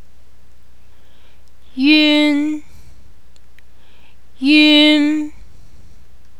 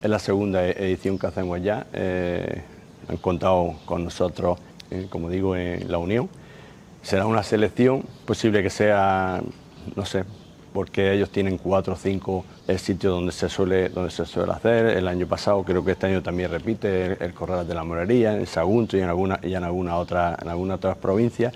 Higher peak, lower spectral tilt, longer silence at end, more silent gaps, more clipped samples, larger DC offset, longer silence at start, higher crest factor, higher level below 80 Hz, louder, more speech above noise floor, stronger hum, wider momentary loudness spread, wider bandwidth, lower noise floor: first, 0 dBFS vs -6 dBFS; second, -3 dB/octave vs -6.5 dB/octave; first, 1.1 s vs 0 s; neither; neither; first, 3% vs under 0.1%; first, 1.75 s vs 0 s; about the same, 18 dB vs 18 dB; about the same, -50 dBFS vs -48 dBFS; first, -12 LUFS vs -24 LUFS; first, 38 dB vs 22 dB; neither; first, 18 LU vs 9 LU; second, 11.5 kHz vs 13.5 kHz; first, -50 dBFS vs -45 dBFS